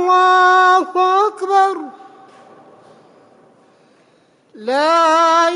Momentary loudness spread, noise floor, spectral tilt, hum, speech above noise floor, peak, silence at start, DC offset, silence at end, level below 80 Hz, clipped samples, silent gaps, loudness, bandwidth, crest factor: 13 LU; -54 dBFS; -1.5 dB/octave; none; 40 dB; -4 dBFS; 0 s; under 0.1%; 0 s; -72 dBFS; under 0.1%; none; -13 LUFS; 11 kHz; 12 dB